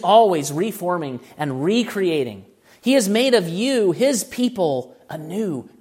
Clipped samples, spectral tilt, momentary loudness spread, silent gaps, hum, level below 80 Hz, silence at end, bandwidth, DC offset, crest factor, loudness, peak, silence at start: under 0.1%; -4.5 dB/octave; 11 LU; none; none; -66 dBFS; 0.15 s; 16 kHz; under 0.1%; 18 dB; -20 LUFS; -2 dBFS; 0 s